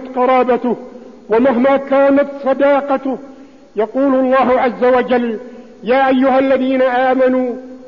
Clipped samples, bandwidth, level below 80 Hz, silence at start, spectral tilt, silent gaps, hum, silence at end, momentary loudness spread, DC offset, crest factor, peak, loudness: under 0.1%; 5.6 kHz; -52 dBFS; 0 s; -7 dB/octave; none; none; 0 s; 10 LU; 0.4%; 10 dB; -4 dBFS; -14 LUFS